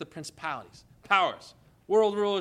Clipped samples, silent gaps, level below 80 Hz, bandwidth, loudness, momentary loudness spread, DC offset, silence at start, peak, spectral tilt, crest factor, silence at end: under 0.1%; none; -68 dBFS; 12 kHz; -27 LUFS; 15 LU; under 0.1%; 0 s; -8 dBFS; -4 dB/octave; 22 dB; 0 s